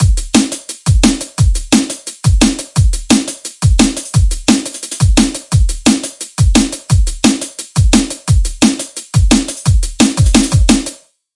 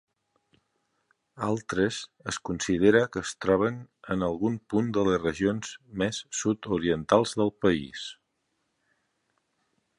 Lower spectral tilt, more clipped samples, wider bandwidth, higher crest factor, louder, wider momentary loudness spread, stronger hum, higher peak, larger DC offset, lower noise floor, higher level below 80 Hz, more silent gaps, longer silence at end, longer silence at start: about the same, -4.5 dB/octave vs -5 dB/octave; neither; about the same, 11.5 kHz vs 11.5 kHz; second, 12 dB vs 22 dB; first, -13 LUFS vs -27 LUFS; second, 6 LU vs 11 LU; neither; first, 0 dBFS vs -6 dBFS; neither; second, -31 dBFS vs -77 dBFS; first, -18 dBFS vs -56 dBFS; neither; second, 0.4 s vs 1.85 s; second, 0 s vs 1.35 s